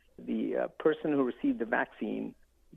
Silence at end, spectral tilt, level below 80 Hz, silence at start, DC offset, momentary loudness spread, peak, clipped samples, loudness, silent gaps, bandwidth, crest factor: 0 s; -8.5 dB/octave; -66 dBFS; 0.2 s; under 0.1%; 7 LU; -14 dBFS; under 0.1%; -32 LUFS; none; 3.9 kHz; 20 dB